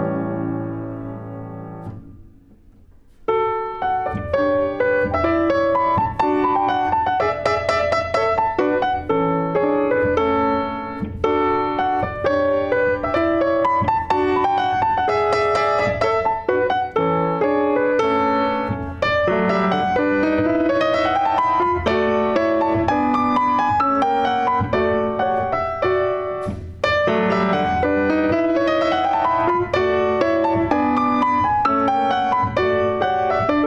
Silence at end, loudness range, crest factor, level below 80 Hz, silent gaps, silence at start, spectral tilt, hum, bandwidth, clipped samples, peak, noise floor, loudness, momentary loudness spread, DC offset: 0 s; 2 LU; 16 dB; -44 dBFS; none; 0 s; -7 dB/octave; none; 9 kHz; under 0.1%; -4 dBFS; -48 dBFS; -19 LUFS; 5 LU; under 0.1%